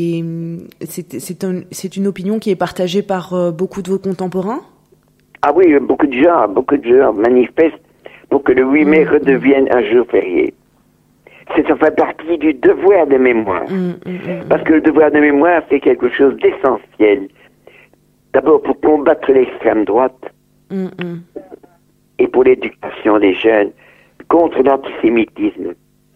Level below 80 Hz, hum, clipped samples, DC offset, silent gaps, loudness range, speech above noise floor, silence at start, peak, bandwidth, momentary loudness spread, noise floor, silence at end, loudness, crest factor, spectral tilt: -50 dBFS; 50 Hz at -50 dBFS; under 0.1%; under 0.1%; none; 6 LU; 41 dB; 0 s; 0 dBFS; 14 kHz; 13 LU; -54 dBFS; 0.45 s; -13 LUFS; 14 dB; -6.5 dB/octave